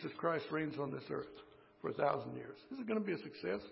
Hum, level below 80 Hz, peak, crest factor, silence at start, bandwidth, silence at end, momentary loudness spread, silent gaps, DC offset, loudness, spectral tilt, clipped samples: none; -76 dBFS; -20 dBFS; 22 dB; 0 s; 5.6 kHz; 0 s; 12 LU; none; under 0.1%; -41 LUFS; -5 dB/octave; under 0.1%